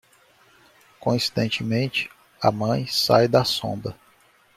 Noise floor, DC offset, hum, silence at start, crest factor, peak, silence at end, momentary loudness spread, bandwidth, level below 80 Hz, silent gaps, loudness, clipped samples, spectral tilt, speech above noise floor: -58 dBFS; under 0.1%; none; 1 s; 22 dB; -4 dBFS; 0.65 s; 12 LU; 16 kHz; -58 dBFS; none; -22 LUFS; under 0.1%; -5 dB/octave; 36 dB